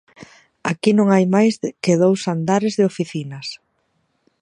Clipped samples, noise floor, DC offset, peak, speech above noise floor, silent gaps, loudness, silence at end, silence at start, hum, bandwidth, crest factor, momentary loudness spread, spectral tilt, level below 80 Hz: under 0.1%; -67 dBFS; under 0.1%; -2 dBFS; 50 dB; none; -18 LUFS; 0.85 s; 0.2 s; none; 11 kHz; 18 dB; 15 LU; -6 dB/octave; -66 dBFS